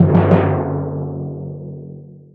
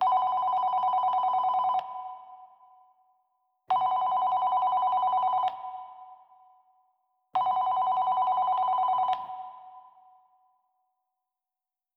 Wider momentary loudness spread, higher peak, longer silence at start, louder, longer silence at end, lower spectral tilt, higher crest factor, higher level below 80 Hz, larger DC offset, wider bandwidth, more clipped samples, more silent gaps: first, 21 LU vs 15 LU; first, 0 dBFS vs -16 dBFS; about the same, 0 s vs 0 s; first, -18 LUFS vs -27 LUFS; second, 0.15 s vs 2.15 s; first, -11.5 dB/octave vs -4 dB/octave; about the same, 18 dB vs 14 dB; first, -50 dBFS vs -82 dBFS; neither; second, 4.2 kHz vs 5.2 kHz; neither; neither